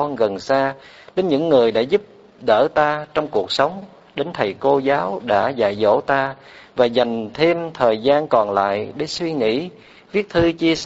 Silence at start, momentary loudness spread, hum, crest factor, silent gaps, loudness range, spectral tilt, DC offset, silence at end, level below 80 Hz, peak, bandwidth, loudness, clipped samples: 0 s; 10 LU; none; 18 dB; none; 1 LU; -3.5 dB/octave; under 0.1%; 0 s; -52 dBFS; 0 dBFS; 8 kHz; -19 LUFS; under 0.1%